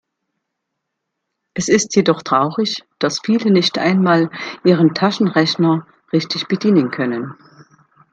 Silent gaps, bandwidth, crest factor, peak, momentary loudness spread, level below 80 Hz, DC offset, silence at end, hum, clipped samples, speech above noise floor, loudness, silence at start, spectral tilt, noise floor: none; 9 kHz; 16 dB; 0 dBFS; 8 LU; -60 dBFS; under 0.1%; 0.8 s; none; under 0.1%; 61 dB; -16 LUFS; 1.55 s; -5 dB/octave; -77 dBFS